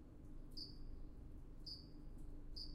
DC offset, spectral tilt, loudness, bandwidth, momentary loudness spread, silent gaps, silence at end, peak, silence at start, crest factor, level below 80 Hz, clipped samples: under 0.1%; -5.5 dB/octave; -56 LUFS; 11.5 kHz; 7 LU; none; 0 s; -38 dBFS; 0 s; 14 dB; -54 dBFS; under 0.1%